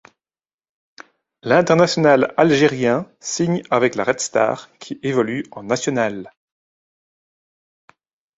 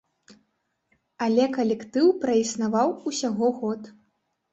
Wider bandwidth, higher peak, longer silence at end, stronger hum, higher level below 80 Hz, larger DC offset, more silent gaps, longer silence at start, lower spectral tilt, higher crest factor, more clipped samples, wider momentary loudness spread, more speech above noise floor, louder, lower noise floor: about the same, 8 kHz vs 8.2 kHz; first, -2 dBFS vs -8 dBFS; first, 2.1 s vs 0.6 s; neither; first, -60 dBFS vs -70 dBFS; neither; neither; first, 1.45 s vs 1.2 s; about the same, -5 dB/octave vs -4.5 dB/octave; about the same, 20 dB vs 16 dB; neither; first, 13 LU vs 8 LU; first, over 72 dB vs 51 dB; first, -18 LUFS vs -24 LUFS; first, under -90 dBFS vs -75 dBFS